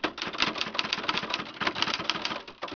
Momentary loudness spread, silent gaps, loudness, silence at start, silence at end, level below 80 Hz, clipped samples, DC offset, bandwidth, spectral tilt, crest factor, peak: 5 LU; none; -29 LUFS; 0 s; 0 s; -62 dBFS; under 0.1%; under 0.1%; 5.4 kHz; -2.5 dB/octave; 26 dB; -6 dBFS